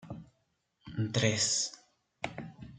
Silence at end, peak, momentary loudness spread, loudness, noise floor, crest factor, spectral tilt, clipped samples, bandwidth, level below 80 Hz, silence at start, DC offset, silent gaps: 0 s; -12 dBFS; 19 LU; -32 LUFS; -77 dBFS; 24 dB; -3 dB/octave; under 0.1%; 9.6 kHz; -64 dBFS; 0 s; under 0.1%; none